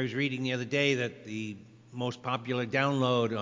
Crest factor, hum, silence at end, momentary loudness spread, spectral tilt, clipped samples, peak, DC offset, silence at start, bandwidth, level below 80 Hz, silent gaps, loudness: 18 dB; none; 0 s; 11 LU; -5.5 dB/octave; under 0.1%; -12 dBFS; under 0.1%; 0 s; 7.6 kHz; -72 dBFS; none; -30 LUFS